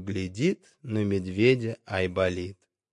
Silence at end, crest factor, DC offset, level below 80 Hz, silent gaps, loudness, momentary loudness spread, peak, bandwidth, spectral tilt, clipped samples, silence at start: 0.4 s; 18 dB; under 0.1%; -66 dBFS; none; -27 LUFS; 12 LU; -8 dBFS; 11 kHz; -6.5 dB/octave; under 0.1%; 0 s